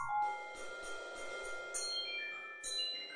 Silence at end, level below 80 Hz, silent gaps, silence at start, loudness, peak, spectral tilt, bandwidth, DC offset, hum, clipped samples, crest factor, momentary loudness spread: 0 s; -68 dBFS; none; 0 s; -40 LUFS; -28 dBFS; 0.5 dB/octave; 10 kHz; under 0.1%; none; under 0.1%; 14 dB; 8 LU